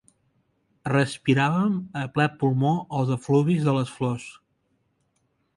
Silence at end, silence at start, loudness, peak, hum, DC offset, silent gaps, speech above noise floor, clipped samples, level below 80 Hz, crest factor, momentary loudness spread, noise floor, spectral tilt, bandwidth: 1.25 s; 0.85 s; -24 LUFS; -8 dBFS; none; under 0.1%; none; 48 dB; under 0.1%; -62 dBFS; 18 dB; 8 LU; -71 dBFS; -7 dB/octave; 11.5 kHz